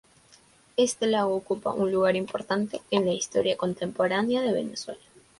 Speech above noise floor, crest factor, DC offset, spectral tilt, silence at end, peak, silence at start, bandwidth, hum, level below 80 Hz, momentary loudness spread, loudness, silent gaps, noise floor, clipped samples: 32 dB; 20 dB; under 0.1%; -4.5 dB/octave; 0.45 s; -8 dBFS; 0.8 s; 11.5 kHz; none; -66 dBFS; 7 LU; -27 LUFS; none; -58 dBFS; under 0.1%